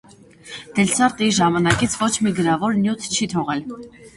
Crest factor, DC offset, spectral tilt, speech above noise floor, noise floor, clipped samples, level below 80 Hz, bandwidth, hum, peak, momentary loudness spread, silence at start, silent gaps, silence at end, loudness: 20 dB; under 0.1%; -4 dB/octave; 23 dB; -42 dBFS; under 0.1%; -48 dBFS; 11.5 kHz; none; 0 dBFS; 14 LU; 0.45 s; none; 0.1 s; -19 LUFS